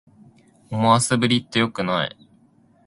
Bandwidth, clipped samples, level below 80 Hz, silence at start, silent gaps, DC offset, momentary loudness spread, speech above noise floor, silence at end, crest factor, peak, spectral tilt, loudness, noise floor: 11.5 kHz; under 0.1%; -58 dBFS; 0.7 s; none; under 0.1%; 9 LU; 37 dB; 0.8 s; 22 dB; -2 dBFS; -4.5 dB/octave; -20 LUFS; -57 dBFS